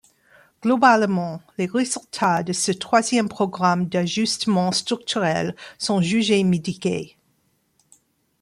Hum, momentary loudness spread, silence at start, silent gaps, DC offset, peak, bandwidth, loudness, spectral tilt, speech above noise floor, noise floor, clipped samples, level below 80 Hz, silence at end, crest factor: none; 9 LU; 0.65 s; none; under 0.1%; -4 dBFS; 12.5 kHz; -21 LUFS; -4.5 dB/octave; 46 dB; -66 dBFS; under 0.1%; -62 dBFS; 1.35 s; 18 dB